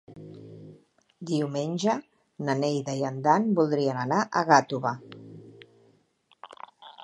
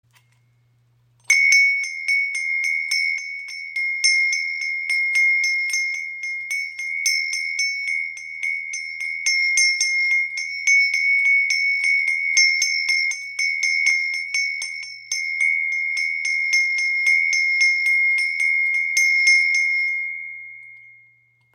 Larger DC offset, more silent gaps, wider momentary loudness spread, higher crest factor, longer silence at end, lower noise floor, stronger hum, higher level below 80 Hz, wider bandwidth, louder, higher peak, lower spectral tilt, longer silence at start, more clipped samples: neither; neither; first, 25 LU vs 11 LU; first, 24 dB vs 18 dB; second, 0 s vs 0.65 s; first, -66 dBFS vs -60 dBFS; neither; first, -76 dBFS vs -84 dBFS; second, 10.5 kHz vs 16.5 kHz; second, -26 LUFS vs -18 LUFS; about the same, -4 dBFS vs -4 dBFS; first, -5.5 dB/octave vs 5.5 dB/octave; second, 0.1 s vs 1.3 s; neither